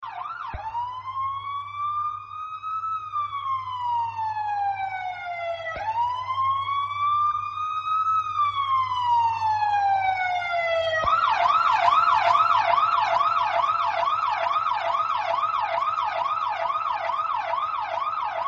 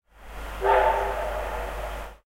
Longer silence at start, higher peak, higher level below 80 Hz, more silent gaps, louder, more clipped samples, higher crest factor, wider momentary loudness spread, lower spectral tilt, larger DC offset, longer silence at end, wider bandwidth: second, 0 s vs 0.2 s; about the same, -8 dBFS vs -8 dBFS; second, -56 dBFS vs -36 dBFS; neither; about the same, -24 LUFS vs -26 LUFS; neither; about the same, 18 dB vs 18 dB; second, 11 LU vs 18 LU; second, -3 dB/octave vs -5 dB/octave; neither; second, 0 s vs 0.15 s; second, 7.8 kHz vs 16 kHz